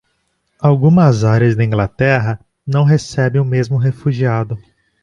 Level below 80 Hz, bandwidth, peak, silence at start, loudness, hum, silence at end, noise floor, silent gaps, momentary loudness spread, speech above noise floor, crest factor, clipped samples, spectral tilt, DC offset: -44 dBFS; 9 kHz; -2 dBFS; 0.6 s; -14 LUFS; none; 0.45 s; -65 dBFS; none; 9 LU; 52 dB; 14 dB; under 0.1%; -8 dB/octave; under 0.1%